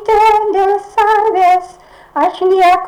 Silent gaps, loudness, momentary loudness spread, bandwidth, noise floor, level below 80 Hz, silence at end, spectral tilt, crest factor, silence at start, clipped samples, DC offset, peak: none; -12 LUFS; 6 LU; 18 kHz; -39 dBFS; -44 dBFS; 0 s; -3.5 dB/octave; 6 dB; 0 s; under 0.1%; under 0.1%; -4 dBFS